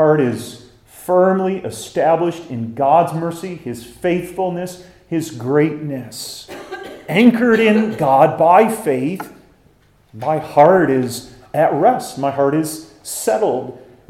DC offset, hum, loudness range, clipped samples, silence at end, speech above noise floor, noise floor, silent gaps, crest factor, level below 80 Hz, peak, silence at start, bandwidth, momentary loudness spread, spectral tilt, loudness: under 0.1%; none; 7 LU; under 0.1%; 0.3 s; 37 dB; -53 dBFS; none; 16 dB; -56 dBFS; 0 dBFS; 0 s; 16.5 kHz; 18 LU; -6 dB/octave; -16 LUFS